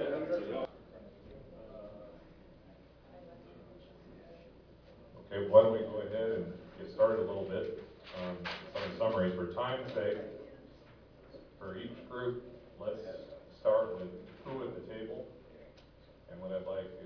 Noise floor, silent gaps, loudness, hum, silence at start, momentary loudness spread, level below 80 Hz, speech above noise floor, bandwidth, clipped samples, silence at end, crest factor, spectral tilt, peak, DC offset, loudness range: -59 dBFS; none; -35 LUFS; none; 0 s; 25 LU; -64 dBFS; 27 dB; 5.4 kHz; under 0.1%; 0 s; 28 dB; -5 dB/octave; -10 dBFS; under 0.1%; 22 LU